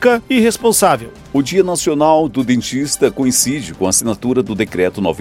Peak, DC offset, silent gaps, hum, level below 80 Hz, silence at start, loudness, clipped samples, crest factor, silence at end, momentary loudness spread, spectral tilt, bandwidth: 0 dBFS; under 0.1%; none; none; -44 dBFS; 0 s; -15 LUFS; under 0.1%; 14 dB; 0 s; 6 LU; -4 dB/octave; 16.5 kHz